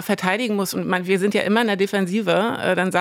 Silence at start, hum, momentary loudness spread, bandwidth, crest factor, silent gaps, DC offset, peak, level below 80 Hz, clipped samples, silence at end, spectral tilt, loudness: 0 s; none; 3 LU; 17.5 kHz; 16 dB; none; under 0.1%; -4 dBFS; -70 dBFS; under 0.1%; 0 s; -5 dB/octave; -20 LUFS